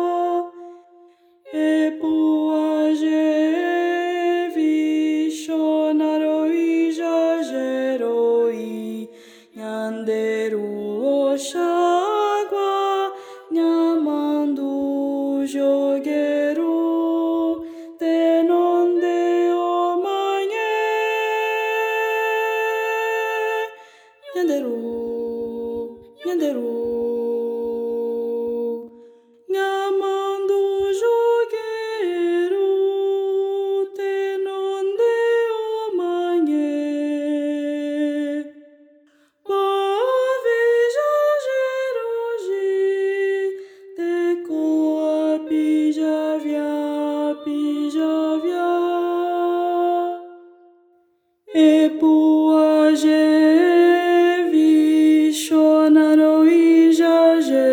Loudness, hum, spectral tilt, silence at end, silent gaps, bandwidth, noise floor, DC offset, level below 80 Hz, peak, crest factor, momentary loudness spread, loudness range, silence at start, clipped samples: -20 LUFS; none; -4 dB/octave; 0 s; none; 16.5 kHz; -63 dBFS; under 0.1%; -70 dBFS; -4 dBFS; 14 dB; 11 LU; 9 LU; 0 s; under 0.1%